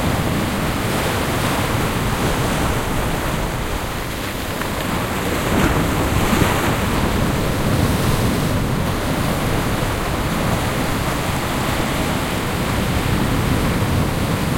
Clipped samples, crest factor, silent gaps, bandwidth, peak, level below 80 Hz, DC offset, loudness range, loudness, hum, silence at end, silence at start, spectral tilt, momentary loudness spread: under 0.1%; 18 dB; none; 16.5 kHz; -2 dBFS; -28 dBFS; under 0.1%; 3 LU; -20 LUFS; none; 0 s; 0 s; -5 dB/octave; 4 LU